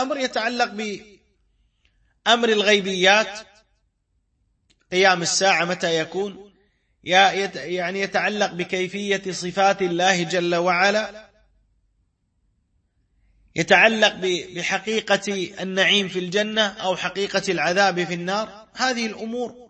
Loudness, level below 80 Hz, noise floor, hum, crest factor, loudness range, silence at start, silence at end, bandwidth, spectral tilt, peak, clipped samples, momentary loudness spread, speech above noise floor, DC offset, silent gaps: -20 LUFS; -64 dBFS; -70 dBFS; none; 20 dB; 3 LU; 0 s; 0.05 s; 8.8 kHz; -3 dB/octave; -2 dBFS; under 0.1%; 11 LU; 49 dB; under 0.1%; none